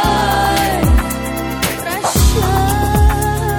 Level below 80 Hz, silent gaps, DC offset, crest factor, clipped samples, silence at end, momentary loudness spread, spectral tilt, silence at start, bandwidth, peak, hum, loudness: -18 dBFS; none; under 0.1%; 12 dB; under 0.1%; 0 s; 5 LU; -4.5 dB/octave; 0 s; 19 kHz; -2 dBFS; none; -15 LUFS